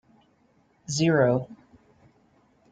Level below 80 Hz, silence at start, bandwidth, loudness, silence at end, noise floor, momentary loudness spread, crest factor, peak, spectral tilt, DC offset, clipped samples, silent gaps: -64 dBFS; 0.9 s; 9.4 kHz; -24 LUFS; 1.15 s; -64 dBFS; 23 LU; 18 dB; -10 dBFS; -5.5 dB/octave; under 0.1%; under 0.1%; none